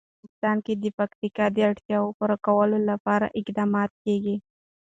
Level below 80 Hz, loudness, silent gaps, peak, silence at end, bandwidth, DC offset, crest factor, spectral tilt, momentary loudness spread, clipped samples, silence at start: -64 dBFS; -25 LUFS; 0.94-0.98 s, 1.15-1.22 s, 1.85-1.89 s, 2.14-2.20 s, 3.00-3.05 s, 3.90-4.05 s; -10 dBFS; 0.45 s; 7.8 kHz; under 0.1%; 16 dB; -8 dB/octave; 7 LU; under 0.1%; 0.45 s